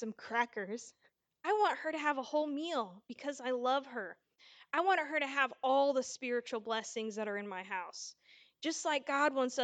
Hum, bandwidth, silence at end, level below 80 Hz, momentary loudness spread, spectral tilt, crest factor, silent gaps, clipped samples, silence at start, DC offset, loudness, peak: none; 9.4 kHz; 0 s; under -90 dBFS; 13 LU; -2.5 dB/octave; 18 dB; none; under 0.1%; 0 s; under 0.1%; -35 LUFS; -18 dBFS